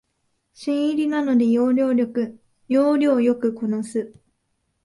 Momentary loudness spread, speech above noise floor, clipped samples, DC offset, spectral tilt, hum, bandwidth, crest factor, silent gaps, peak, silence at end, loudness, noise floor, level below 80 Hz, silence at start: 11 LU; 52 dB; under 0.1%; under 0.1%; -6.5 dB/octave; none; 11.5 kHz; 14 dB; none; -8 dBFS; 0.75 s; -21 LUFS; -72 dBFS; -66 dBFS; 0.6 s